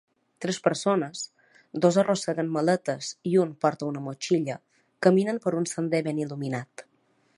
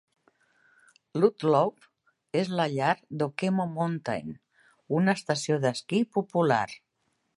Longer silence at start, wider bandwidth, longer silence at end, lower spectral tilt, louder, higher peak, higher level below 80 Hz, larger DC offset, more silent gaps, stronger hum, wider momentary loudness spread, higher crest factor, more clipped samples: second, 0.4 s vs 1.15 s; about the same, 11.5 kHz vs 11.5 kHz; about the same, 0.55 s vs 0.6 s; about the same, -5.5 dB/octave vs -6 dB/octave; about the same, -26 LUFS vs -28 LUFS; about the same, -6 dBFS vs -8 dBFS; about the same, -76 dBFS vs -72 dBFS; neither; neither; neither; about the same, 12 LU vs 10 LU; about the same, 22 dB vs 20 dB; neither